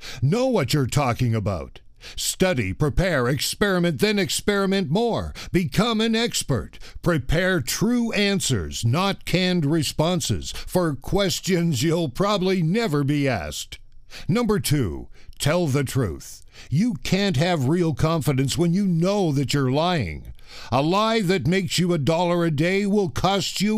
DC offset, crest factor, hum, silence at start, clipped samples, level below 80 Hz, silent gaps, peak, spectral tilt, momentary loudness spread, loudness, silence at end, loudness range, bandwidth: under 0.1%; 16 dB; none; 0 s; under 0.1%; -40 dBFS; none; -6 dBFS; -5 dB/octave; 7 LU; -22 LUFS; 0 s; 2 LU; 15.5 kHz